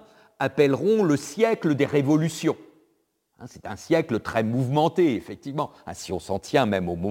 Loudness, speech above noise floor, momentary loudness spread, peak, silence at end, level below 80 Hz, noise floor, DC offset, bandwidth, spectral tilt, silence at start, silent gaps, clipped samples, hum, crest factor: -24 LUFS; 47 dB; 12 LU; -6 dBFS; 0 s; -58 dBFS; -70 dBFS; under 0.1%; 17 kHz; -6.5 dB/octave; 0.4 s; none; under 0.1%; none; 18 dB